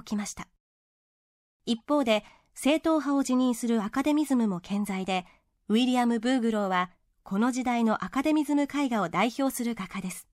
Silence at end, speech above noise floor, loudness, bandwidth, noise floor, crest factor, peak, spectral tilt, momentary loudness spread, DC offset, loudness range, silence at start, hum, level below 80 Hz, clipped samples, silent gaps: 0.1 s; over 63 dB; -27 LUFS; 16 kHz; under -90 dBFS; 16 dB; -12 dBFS; -5 dB/octave; 8 LU; under 0.1%; 2 LU; 0.05 s; none; -62 dBFS; under 0.1%; 0.60-1.60 s